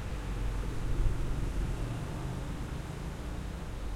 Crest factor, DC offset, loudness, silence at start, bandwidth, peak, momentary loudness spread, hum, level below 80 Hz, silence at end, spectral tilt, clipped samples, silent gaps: 18 dB; under 0.1%; -38 LUFS; 0 s; 14.5 kHz; -16 dBFS; 6 LU; none; -36 dBFS; 0 s; -6.5 dB/octave; under 0.1%; none